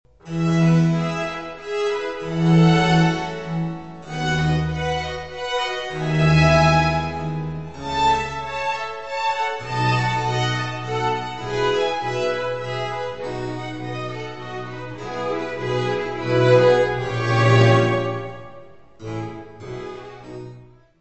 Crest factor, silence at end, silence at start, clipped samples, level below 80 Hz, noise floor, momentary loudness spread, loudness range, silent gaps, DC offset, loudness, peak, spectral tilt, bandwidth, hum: 18 dB; 0.05 s; 0.05 s; under 0.1%; -42 dBFS; -45 dBFS; 17 LU; 8 LU; none; 0.7%; -21 LUFS; -2 dBFS; -6.5 dB/octave; 8.4 kHz; none